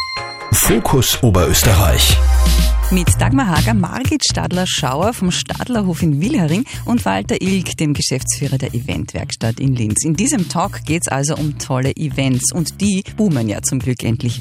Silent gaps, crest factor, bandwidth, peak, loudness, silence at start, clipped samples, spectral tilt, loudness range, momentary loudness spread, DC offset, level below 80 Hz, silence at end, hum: none; 14 dB; 16 kHz; 0 dBFS; -16 LUFS; 0 s; under 0.1%; -4.5 dB/octave; 5 LU; 8 LU; under 0.1%; -22 dBFS; 0 s; none